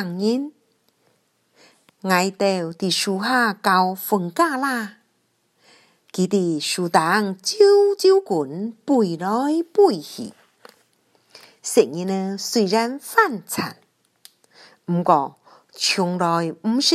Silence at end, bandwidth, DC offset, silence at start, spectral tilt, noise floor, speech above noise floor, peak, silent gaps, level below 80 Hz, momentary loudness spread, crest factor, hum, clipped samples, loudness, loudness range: 0 s; 14.5 kHz; under 0.1%; 0 s; -4 dB/octave; -67 dBFS; 47 dB; -2 dBFS; none; -74 dBFS; 12 LU; 20 dB; none; under 0.1%; -20 LUFS; 5 LU